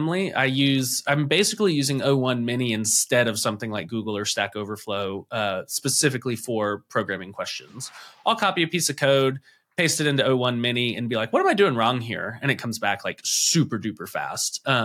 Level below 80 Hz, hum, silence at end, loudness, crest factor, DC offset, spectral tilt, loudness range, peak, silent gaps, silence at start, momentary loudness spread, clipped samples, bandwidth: -74 dBFS; none; 0 s; -23 LUFS; 16 dB; under 0.1%; -3.5 dB/octave; 4 LU; -6 dBFS; none; 0 s; 10 LU; under 0.1%; 17 kHz